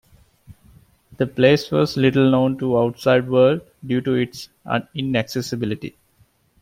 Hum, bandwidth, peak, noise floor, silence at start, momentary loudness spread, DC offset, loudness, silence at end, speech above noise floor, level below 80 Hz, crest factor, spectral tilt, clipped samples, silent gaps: none; 16 kHz; -2 dBFS; -59 dBFS; 0.5 s; 11 LU; under 0.1%; -20 LUFS; 0.7 s; 40 dB; -54 dBFS; 18 dB; -6.5 dB/octave; under 0.1%; none